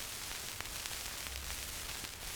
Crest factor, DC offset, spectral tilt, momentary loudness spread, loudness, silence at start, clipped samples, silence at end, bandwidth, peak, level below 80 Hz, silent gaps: 28 dB; under 0.1%; -1 dB/octave; 1 LU; -41 LUFS; 0 s; under 0.1%; 0 s; over 20 kHz; -14 dBFS; -52 dBFS; none